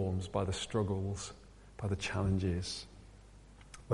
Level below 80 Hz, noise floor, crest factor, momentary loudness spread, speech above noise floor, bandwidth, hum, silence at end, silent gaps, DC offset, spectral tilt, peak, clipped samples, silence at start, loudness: -54 dBFS; -56 dBFS; 18 dB; 22 LU; 21 dB; 11.5 kHz; none; 0 s; none; under 0.1%; -5.5 dB/octave; -18 dBFS; under 0.1%; 0 s; -37 LUFS